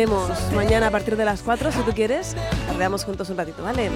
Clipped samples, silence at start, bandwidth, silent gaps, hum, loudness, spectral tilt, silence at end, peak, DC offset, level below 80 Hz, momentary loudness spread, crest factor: under 0.1%; 0 s; 17 kHz; none; none; -23 LUFS; -5.5 dB/octave; 0 s; -6 dBFS; under 0.1%; -34 dBFS; 8 LU; 16 dB